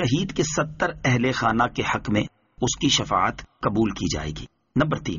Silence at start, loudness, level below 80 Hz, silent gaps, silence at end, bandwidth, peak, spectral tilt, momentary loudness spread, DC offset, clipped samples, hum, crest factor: 0 s; -24 LUFS; -44 dBFS; none; 0 s; 7.4 kHz; -6 dBFS; -4 dB/octave; 8 LU; under 0.1%; under 0.1%; none; 18 dB